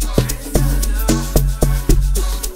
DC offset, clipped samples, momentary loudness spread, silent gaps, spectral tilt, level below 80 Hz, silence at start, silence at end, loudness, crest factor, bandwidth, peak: 0.6%; under 0.1%; 3 LU; none; -5 dB/octave; -16 dBFS; 0 s; 0 s; -18 LUFS; 14 dB; 16.5 kHz; 0 dBFS